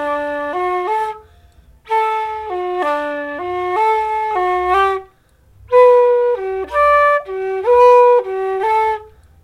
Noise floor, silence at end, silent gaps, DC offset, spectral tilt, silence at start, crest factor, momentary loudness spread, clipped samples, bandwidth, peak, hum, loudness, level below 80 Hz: -51 dBFS; 0.35 s; none; under 0.1%; -5 dB/octave; 0 s; 14 dB; 13 LU; under 0.1%; 11 kHz; -2 dBFS; none; -15 LUFS; -48 dBFS